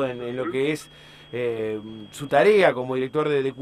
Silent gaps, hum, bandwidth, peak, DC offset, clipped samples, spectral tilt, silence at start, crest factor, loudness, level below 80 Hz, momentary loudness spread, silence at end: none; none; 13.5 kHz; -6 dBFS; under 0.1%; under 0.1%; -5.5 dB/octave; 0 s; 18 dB; -23 LUFS; -62 dBFS; 16 LU; 0 s